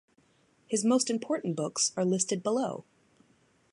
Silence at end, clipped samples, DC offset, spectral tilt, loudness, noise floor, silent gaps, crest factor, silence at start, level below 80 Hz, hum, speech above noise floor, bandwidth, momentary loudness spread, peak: 0.9 s; under 0.1%; under 0.1%; -4 dB/octave; -29 LUFS; -67 dBFS; none; 18 dB; 0.7 s; -80 dBFS; none; 38 dB; 11.5 kHz; 7 LU; -12 dBFS